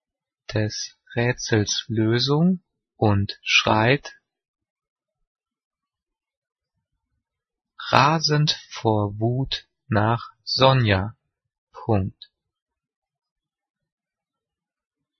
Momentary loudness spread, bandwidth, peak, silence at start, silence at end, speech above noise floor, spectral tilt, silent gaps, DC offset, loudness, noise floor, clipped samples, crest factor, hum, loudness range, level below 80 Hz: 12 LU; 6.6 kHz; 0 dBFS; 0.5 s; 3.1 s; 67 dB; -5 dB/octave; 4.48-4.54 s, 4.70-4.76 s, 4.90-4.96 s, 5.27-5.35 s, 5.64-5.71 s, 6.37-6.42 s, 11.58-11.67 s; under 0.1%; -22 LUFS; -88 dBFS; under 0.1%; 24 dB; none; 11 LU; -54 dBFS